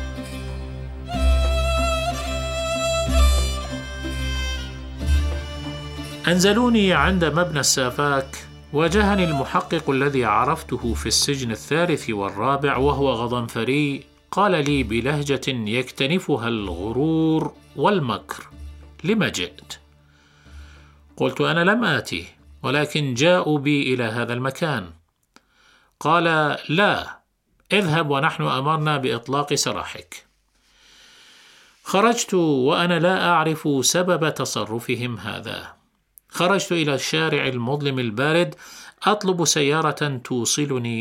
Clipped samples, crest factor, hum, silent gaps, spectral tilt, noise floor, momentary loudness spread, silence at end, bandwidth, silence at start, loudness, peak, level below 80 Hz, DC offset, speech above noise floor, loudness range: under 0.1%; 20 dB; none; none; -4.5 dB/octave; -65 dBFS; 13 LU; 0 s; 16.5 kHz; 0 s; -21 LUFS; -2 dBFS; -32 dBFS; under 0.1%; 44 dB; 5 LU